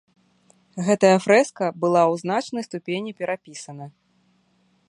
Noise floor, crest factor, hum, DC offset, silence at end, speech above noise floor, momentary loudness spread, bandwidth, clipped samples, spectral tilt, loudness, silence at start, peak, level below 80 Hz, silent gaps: -64 dBFS; 20 dB; none; under 0.1%; 1 s; 43 dB; 21 LU; 11.5 kHz; under 0.1%; -5.5 dB/octave; -21 LUFS; 0.75 s; -2 dBFS; -70 dBFS; none